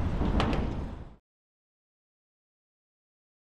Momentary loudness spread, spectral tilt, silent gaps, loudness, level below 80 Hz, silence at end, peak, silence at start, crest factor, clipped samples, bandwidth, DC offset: 18 LU; -7.5 dB/octave; none; -31 LUFS; -38 dBFS; 2.2 s; -10 dBFS; 0 s; 22 dB; under 0.1%; 10 kHz; under 0.1%